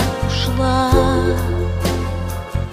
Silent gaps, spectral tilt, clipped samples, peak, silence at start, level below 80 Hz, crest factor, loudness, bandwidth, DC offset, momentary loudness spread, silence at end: none; -6 dB/octave; under 0.1%; -2 dBFS; 0 s; -26 dBFS; 16 dB; -18 LUFS; 16 kHz; under 0.1%; 9 LU; 0 s